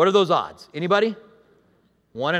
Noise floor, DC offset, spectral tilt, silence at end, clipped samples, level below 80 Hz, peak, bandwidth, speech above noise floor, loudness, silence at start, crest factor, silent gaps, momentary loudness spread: -62 dBFS; under 0.1%; -5.5 dB/octave; 0 s; under 0.1%; -68 dBFS; -4 dBFS; 11 kHz; 42 dB; -22 LUFS; 0 s; 18 dB; none; 20 LU